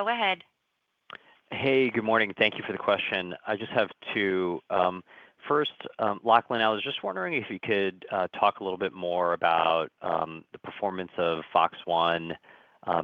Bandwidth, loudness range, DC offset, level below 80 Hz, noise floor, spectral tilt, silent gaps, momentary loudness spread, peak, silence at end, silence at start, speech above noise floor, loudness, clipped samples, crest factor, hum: 6.2 kHz; 2 LU; under 0.1%; -70 dBFS; -78 dBFS; -7 dB/octave; none; 13 LU; -4 dBFS; 0 s; 0 s; 50 dB; -27 LUFS; under 0.1%; 24 dB; none